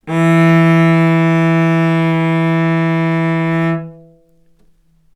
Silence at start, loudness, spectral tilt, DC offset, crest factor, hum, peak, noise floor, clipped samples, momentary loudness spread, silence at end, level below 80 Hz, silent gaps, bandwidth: 0.05 s; -13 LUFS; -8 dB/octave; under 0.1%; 14 dB; none; 0 dBFS; -53 dBFS; under 0.1%; 6 LU; 1.2 s; -58 dBFS; none; 8.4 kHz